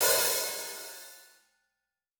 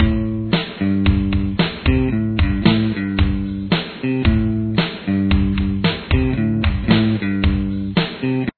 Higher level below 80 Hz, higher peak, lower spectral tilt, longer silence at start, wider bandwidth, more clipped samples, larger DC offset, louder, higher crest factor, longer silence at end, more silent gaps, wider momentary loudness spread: second, -72 dBFS vs -26 dBFS; second, -12 dBFS vs 0 dBFS; second, 1 dB/octave vs -10 dB/octave; about the same, 0 s vs 0 s; first, over 20 kHz vs 4.6 kHz; neither; neither; second, -28 LUFS vs -19 LUFS; about the same, 22 dB vs 18 dB; first, 0.95 s vs 0.05 s; neither; first, 21 LU vs 4 LU